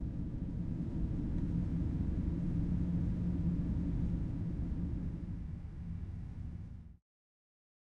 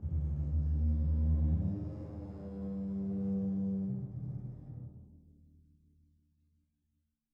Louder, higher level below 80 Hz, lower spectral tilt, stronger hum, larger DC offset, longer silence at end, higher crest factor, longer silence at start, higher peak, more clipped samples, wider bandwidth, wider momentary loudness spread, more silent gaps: about the same, -38 LUFS vs -36 LUFS; about the same, -42 dBFS vs -40 dBFS; second, -10.5 dB/octave vs -12.5 dB/octave; neither; neither; second, 1.05 s vs 2.15 s; about the same, 14 dB vs 14 dB; about the same, 0 s vs 0 s; about the same, -24 dBFS vs -22 dBFS; neither; first, 5.2 kHz vs 1.7 kHz; second, 10 LU vs 15 LU; neither